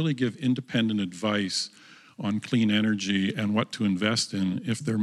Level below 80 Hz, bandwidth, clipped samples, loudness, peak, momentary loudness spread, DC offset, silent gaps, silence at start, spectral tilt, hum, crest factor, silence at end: -74 dBFS; 12 kHz; under 0.1%; -27 LUFS; -8 dBFS; 6 LU; under 0.1%; none; 0 s; -5 dB/octave; none; 18 dB; 0 s